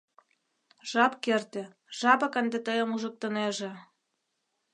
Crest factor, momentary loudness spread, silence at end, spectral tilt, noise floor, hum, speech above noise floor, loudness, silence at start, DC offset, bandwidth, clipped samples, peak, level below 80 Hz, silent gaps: 24 dB; 16 LU; 0.95 s; -3.5 dB/octave; -80 dBFS; none; 51 dB; -28 LUFS; 0.85 s; under 0.1%; 10.5 kHz; under 0.1%; -8 dBFS; -84 dBFS; none